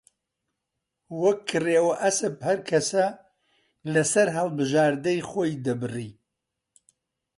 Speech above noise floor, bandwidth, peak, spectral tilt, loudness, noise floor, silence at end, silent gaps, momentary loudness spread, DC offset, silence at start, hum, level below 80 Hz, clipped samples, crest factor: 59 dB; 11.5 kHz; -8 dBFS; -4.5 dB/octave; -24 LUFS; -83 dBFS; 1.25 s; none; 9 LU; under 0.1%; 1.1 s; none; -68 dBFS; under 0.1%; 18 dB